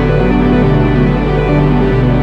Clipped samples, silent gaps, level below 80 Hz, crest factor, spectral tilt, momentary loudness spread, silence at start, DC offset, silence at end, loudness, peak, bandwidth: under 0.1%; none; -18 dBFS; 10 dB; -9.5 dB/octave; 2 LU; 0 s; under 0.1%; 0 s; -11 LUFS; 0 dBFS; 5.8 kHz